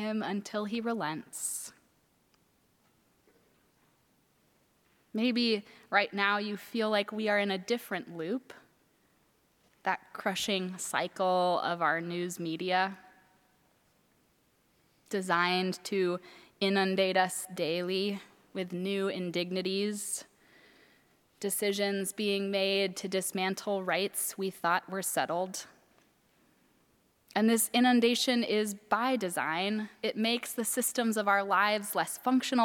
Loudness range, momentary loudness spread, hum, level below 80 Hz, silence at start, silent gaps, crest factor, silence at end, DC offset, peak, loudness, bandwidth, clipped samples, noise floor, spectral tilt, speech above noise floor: 7 LU; 9 LU; none; -82 dBFS; 0 s; none; 22 dB; 0 s; under 0.1%; -12 dBFS; -31 LUFS; 18.5 kHz; under 0.1%; -70 dBFS; -3.5 dB/octave; 39 dB